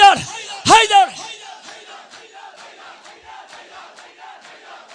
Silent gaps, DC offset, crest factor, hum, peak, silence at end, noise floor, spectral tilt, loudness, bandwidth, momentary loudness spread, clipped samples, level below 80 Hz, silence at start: none; under 0.1%; 18 dB; none; 0 dBFS; 3.6 s; -41 dBFS; -1.5 dB/octave; -13 LUFS; 10 kHz; 28 LU; under 0.1%; -56 dBFS; 0 s